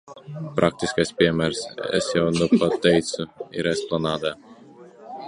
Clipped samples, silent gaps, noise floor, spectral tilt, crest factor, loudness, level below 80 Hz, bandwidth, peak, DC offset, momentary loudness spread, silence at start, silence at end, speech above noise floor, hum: under 0.1%; none; -46 dBFS; -5 dB/octave; 22 dB; -23 LUFS; -52 dBFS; 11.5 kHz; -2 dBFS; under 0.1%; 12 LU; 0.05 s; 0 s; 24 dB; none